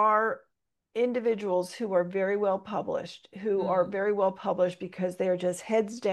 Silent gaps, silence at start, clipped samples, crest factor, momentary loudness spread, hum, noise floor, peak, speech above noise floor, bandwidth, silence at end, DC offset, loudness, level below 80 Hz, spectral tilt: none; 0 s; under 0.1%; 16 dB; 7 LU; none; -79 dBFS; -12 dBFS; 51 dB; 12.5 kHz; 0 s; under 0.1%; -29 LUFS; -76 dBFS; -6 dB/octave